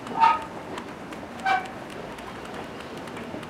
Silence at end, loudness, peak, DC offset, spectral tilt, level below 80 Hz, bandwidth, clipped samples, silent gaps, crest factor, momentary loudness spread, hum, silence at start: 0 s; -29 LUFS; -6 dBFS; under 0.1%; -4.5 dB/octave; -58 dBFS; 15.5 kHz; under 0.1%; none; 24 dB; 16 LU; none; 0 s